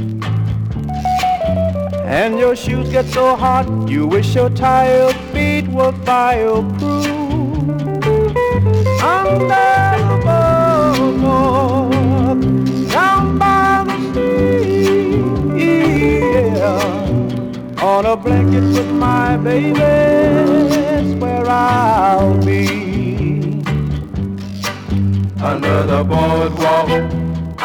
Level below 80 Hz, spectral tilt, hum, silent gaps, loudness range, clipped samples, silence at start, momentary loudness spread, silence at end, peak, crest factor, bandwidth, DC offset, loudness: -34 dBFS; -7 dB/octave; none; none; 3 LU; under 0.1%; 0 s; 7 LU; 0 s; -2 dBFS; 12 dB; 18.5 kHz; under 0.1%; -14 LUFS